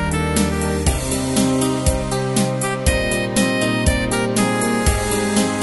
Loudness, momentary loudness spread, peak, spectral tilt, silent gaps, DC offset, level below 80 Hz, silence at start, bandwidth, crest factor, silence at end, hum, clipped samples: -18 LUFS; 2 LU; -2 dBFS; -4.5 dB/octave; none; 0.2%; -28 dBFS; 0 s; 12 kHz; 16 dB; 0 s; none; under 0.1%